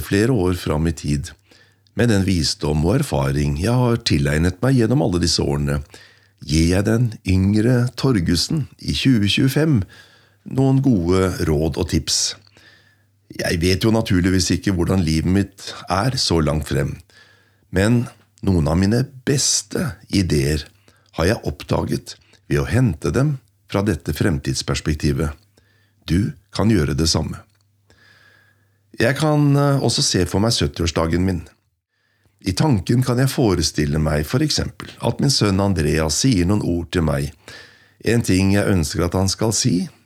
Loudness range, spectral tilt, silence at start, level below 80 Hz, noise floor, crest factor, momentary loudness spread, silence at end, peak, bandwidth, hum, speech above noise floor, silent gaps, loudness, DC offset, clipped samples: 3 LU; -5 dB/octave; 0 s; -38 dBFS; -68 dBFS; 14 dB; 9 LU; 0.15 s; -4 dBFS; 16 kHz; none; 49 dB; none; -19 LUFS; under 0.1%; under 0.1%